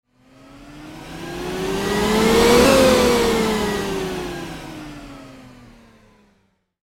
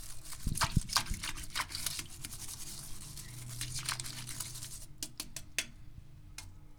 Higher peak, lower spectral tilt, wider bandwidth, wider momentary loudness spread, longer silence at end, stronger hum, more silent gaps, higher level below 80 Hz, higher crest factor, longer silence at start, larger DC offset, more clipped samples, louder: first, 0 dBFS vs -12 dBFS; first, -4 dB/octave vs -2 dB/octave; second, 17 kHz vs over 20 kHz; first, 25 LU vs 16 LU; first, 1.35 s vs 0 s; neither; neither; first, -38 dBFS vs -46 dBFS; second, 20 dB vs 28 dB; first, 0.55 s vs 0 s; neither; neither; first, -17 LUFS vs -38 LUFS